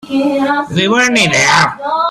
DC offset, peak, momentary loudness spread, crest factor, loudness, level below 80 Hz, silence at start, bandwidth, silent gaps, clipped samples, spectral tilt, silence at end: under 0.1%; 0 dBFS; 6 LU; 12 dB; -11 LUFS; -48 dBFS; 0.05 s; 13.5 kHz; none; under 0.1%; -3.5 dB/octave; 0 s